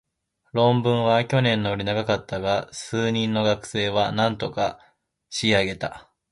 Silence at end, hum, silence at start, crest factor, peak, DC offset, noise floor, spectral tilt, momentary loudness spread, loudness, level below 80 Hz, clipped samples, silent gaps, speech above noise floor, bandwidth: 0.3 s; none; 0.55 s; 18 dB; -4 dBFS; under 0.1%; -72 dBFS; -5.5 dB/octave; 8 LU; -23 LUFS; -52 dBFS; under 0.1%; none; 49 dB; 11.5 kHz